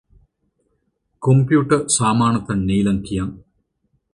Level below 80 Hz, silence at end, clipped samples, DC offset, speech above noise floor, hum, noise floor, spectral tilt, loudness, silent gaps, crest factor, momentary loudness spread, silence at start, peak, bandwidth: -42 dBFS; 0.75 s; under 0.1%; under 0.1%; 52 dB; none; -69 dBFS; -5.5 dB/octave; -18 LUFS; none; 18 dB; 10 LU; 1.2 s; -2 dBFS; 11.5 kHz